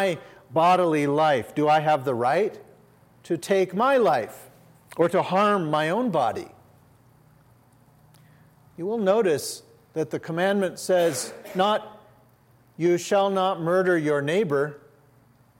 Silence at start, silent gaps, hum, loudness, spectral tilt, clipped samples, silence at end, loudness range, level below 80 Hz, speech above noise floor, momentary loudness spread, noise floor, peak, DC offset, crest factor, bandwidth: 0 s; none; none; -23 LUFS; -5 dB/octave; under 0.1%; 0.8 s; 6 LU; -72 dBFS; 35 dB; 11 LU; -58 dBFS; -8 dBFS; under 0.1%; 16 dB; 16.5 kHz